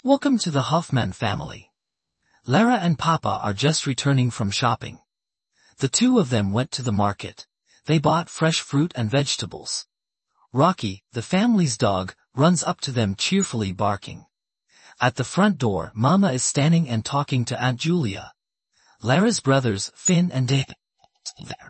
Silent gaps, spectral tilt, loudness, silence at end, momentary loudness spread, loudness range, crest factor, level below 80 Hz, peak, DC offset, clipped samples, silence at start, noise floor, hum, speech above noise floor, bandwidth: none; -5 dB/octave; -22 LUFS; 0 s; 11 LU; 2 LU; 18 dB; -58 dBFS; -4 dBFS; under 0.1%; under 0.1%; 0.05 s; -84 dBFS; none; 63 dB; 8.8 kHz